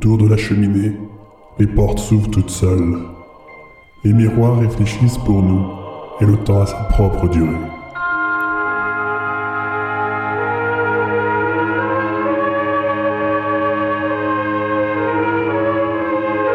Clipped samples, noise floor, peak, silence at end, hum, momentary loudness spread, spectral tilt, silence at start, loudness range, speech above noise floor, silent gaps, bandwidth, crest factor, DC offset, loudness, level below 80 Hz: under 0.1%; -41 dBFS; -2 dBFS; 0 s; none; 6 LU; -7.5 dB/octave; 0 s; 3 LU; 27 dB; none; 13 kHz; 14 dB; under 0.1%; -17 LUFS; -30 dBFS